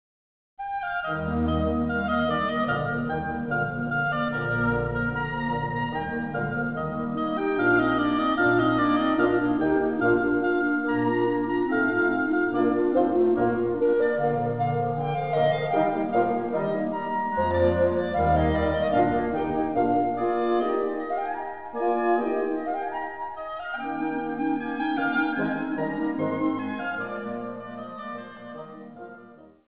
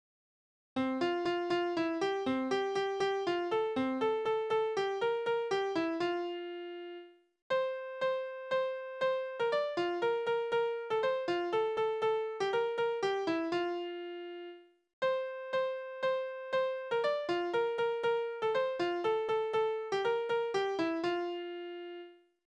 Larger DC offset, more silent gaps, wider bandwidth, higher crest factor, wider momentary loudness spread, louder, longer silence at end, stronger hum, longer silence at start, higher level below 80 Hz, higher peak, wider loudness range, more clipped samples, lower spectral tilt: first, 0.3% vs under 0.1%; second, none vs 7.42-7.50 s, 14.93-15.02 s; second, 4 kHz vs 9.2 kHz; about the same, 16 dB vs 14 dB; about the same, 10 LU vs 9 LU; first, -25 LUFS vs -34 LUFS; second, 0.15 s vs 0.35 s; neither; second, 0.6 s vs 0.75 s; first, -44 dBFS vs -76 dBFS; first, -10 dBFS vs -20 dBFS; about the same, 5 LU vs 3 LU; neither; first, -10.5 dB/octave vs -5 dB/octave